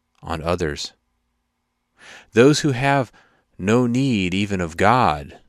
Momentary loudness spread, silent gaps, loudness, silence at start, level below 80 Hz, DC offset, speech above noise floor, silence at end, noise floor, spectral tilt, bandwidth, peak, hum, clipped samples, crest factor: 13 LU; none; -19 LUFS; 0.25 s; -42 dBFS; under 0.1%; 54 dB; 0.1 s; -73 dBFS; -5.5 dB/octave; 14.5 kHz; 0 dBFS; none; under 0.1%; 20 dB